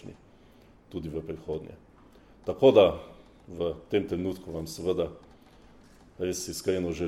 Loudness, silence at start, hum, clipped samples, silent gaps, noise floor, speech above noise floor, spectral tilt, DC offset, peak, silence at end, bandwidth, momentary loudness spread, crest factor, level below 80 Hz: -28 LUFS; 0.05 s; none; under 0.1%; none; -56 dBFS; 29 dB; -5.5 dB/octave; under 0.1%; -6 dBFS; 0 s; 15 kHz; 20 LU; 24 dB; -54 dBFS